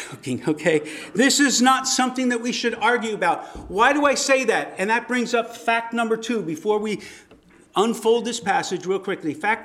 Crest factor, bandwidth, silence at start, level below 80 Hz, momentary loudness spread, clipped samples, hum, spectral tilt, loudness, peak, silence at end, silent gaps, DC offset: 18 dB; 15.5 kHz; 0 s; -56 dBFS; 10 LU; under 0.1%; none; -3 dB/octave; -21 LUFS; -2 dBFS; 0 s; none; under 0.1%